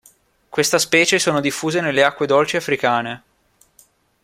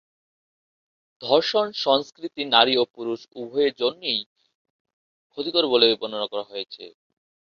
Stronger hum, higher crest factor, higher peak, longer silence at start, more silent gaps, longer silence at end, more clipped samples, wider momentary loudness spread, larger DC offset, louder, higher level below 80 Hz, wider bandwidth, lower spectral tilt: neither; second, 18 dB vs 24 dB; about the same, -2 dBFS vs -2 dBFS; second, 0.5 s vs 1.2 s; second, none vs 4.26-4.36 s, 4.55-4.85 s, 4.93-5.30 s; first, 1.05 s vs 0.7 s; neither; second, 8 LU vs 16 LU; neither; first, -17 LUFS vs -22 LUFS; first, -60 dBFS vs -70 dBFS; first, 16.5 kHz vs 7 kHz; about the same, -3 dB/octave vs -4 dB/octave